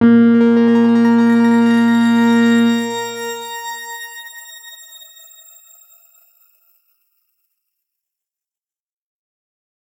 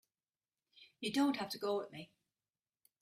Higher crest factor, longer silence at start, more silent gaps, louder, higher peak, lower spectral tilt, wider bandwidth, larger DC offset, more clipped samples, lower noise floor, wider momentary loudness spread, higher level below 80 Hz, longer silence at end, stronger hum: about the same, 16 dB vs 18 dB; second, 0 s vs 0.8 s; neither; first, -13 LUFS vs -38 LUFS; first, -2 dBFS vs -24 dBFS; first, -5.5 dB/octave vs -4 dB/octave; about the same, 16 kHz vs 15 kHz; neither; neither; about the same, under -90 dBFS vs under -90 dBFS; first, 21 LU vs 18 LU; first, -66 dBFS vs -82 dBFS; first, 5.25 s vs 0.95 s; neither